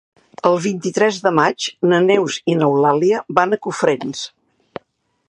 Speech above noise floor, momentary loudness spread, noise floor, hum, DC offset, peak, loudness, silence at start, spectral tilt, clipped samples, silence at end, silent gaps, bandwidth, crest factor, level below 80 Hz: 49 dB; 15 LU; -65 dBFS; none; under 0.1%; 0 dBFS; -17 LUFS; 0.45 s; -5 dB/octave; under 0.1%; 1 s; none; 11 kHz; 18 dB; -64 dBFS